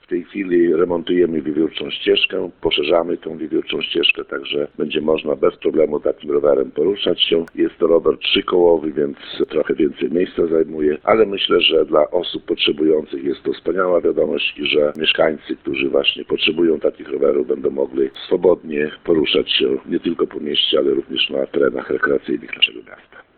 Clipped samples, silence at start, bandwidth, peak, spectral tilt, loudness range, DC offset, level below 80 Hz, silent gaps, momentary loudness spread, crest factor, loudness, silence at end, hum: under 0.1%; 0.1 s; 4.6 kHz; 0 dBFS; -7.5 dB/octave; 2 LU; under 0.1%; -50 dBFS; none; 7 LU; 18 dB; -18 LUFS; 0.15 s; none